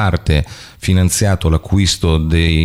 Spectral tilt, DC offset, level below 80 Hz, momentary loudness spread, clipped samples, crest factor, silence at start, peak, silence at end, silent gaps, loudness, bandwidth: -5 dB/octave; under 0.1%; -22 dBFS; 4 LU; under 0.1%; 10 dB; 0 s; -4 dBFS; 0 s; none; -15 LUFS; 15 kHz